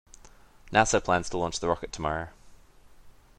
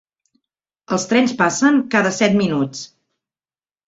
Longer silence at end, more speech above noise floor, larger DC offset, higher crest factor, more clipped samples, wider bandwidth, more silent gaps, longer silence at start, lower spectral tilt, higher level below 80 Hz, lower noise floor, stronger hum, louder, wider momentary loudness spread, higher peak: second, 0.3 s vs 1 s; second, 26 dB vs over 73 dB; neither; first, 26 dB vs 18 dB; neither; first, 11.5 kHz vs 8 kHz; neither; second, 0.65 s vs 0.9 s; about the same, -3.5 dB/octave vs -4.5 dB/octave; first, -48 dBFS vs -58 dBFS; second, -53 dBFS vs under -90 dBFS; neither; second, -27 LUFS vs -17 LUFS; about the same, 9 LU vs 10 LU; about the same, -4 dBFS vs -2 dBFS